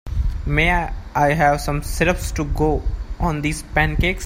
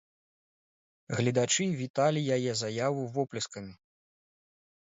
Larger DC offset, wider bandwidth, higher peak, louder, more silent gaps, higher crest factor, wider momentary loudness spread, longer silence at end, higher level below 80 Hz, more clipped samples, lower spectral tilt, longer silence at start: neither; first, 16 kHz vs 8 kHz; first, -2 dBFS vs -14 dBFS; first, -20 LUFS vs -30 LUFS; second, none vs 1.90-1.94 s; about the same, 18 dB vs 18 dB; about the same, 8 LU vs 10 LU; second, 0 s vs 1.1 s; first, -26 dBFS vs -70 dBFS; neither; about the same, -5.5 dB/octave vs -4.5 dB/octave; second, 0.05 s vs 1.1 s